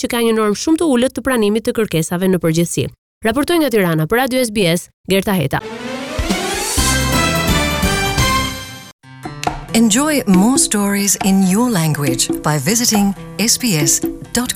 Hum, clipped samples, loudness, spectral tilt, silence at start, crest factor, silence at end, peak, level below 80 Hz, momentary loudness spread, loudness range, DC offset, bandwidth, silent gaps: none; under 0.1%; -15 LUFS; -4 dB/octave; 0 s; 14 dB; 0 s; -2 dBFS; -32 dBFS; 9 LU; 3 LU; under 0.1%; 18 kHz; 2.98-3.21 s, 4.94-5.04 s, 8.93-8.99 s